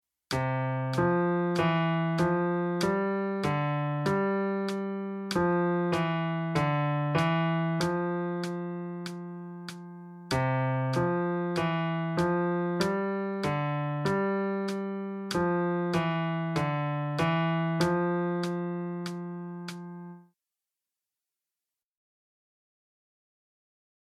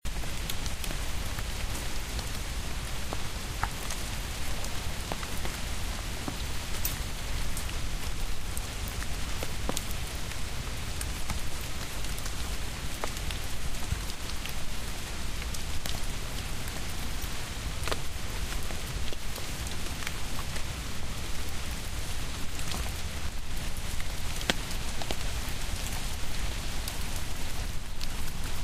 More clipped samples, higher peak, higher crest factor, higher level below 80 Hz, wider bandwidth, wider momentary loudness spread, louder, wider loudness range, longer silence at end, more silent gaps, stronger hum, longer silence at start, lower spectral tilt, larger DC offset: neither; second, -12 dBFS vs -4 dBFS; second, 18 dB vs 26 dB; second, -60 dBFS vs -36 dBFS; second, 13.5 kHz vs 16 kHz; first, 11 LU vs 3 LU; first, -29 LUFS vs -35 LUFS; first, 5 LU vs 2 LU; first, 3.8 s vs 0 s; neither; neither; first, 0.3 s vs 0.05 s; first, -7 dB/octave vs -3 dB/octave; neither